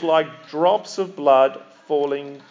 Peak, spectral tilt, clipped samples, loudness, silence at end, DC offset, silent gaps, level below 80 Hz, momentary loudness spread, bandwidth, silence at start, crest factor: -4 dBFS; -5 dB/octave; under 0.1%; -20 LUFS; 0.1 s; under 0.1%; none; under -90 dBFS; 13 LU; 7.6 kHz; 0 s; 16 dB